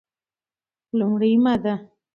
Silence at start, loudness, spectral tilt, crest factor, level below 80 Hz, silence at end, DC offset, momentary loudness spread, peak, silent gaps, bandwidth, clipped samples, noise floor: 0.95 s; -21 LUFS; -9 dB/octave; 14 dB; -62 dBFS; 0.3 s; under 0.1%; 10 LU; -10 dBFS; none; 5.4 kHz; under 0.1%; under -90 dBFS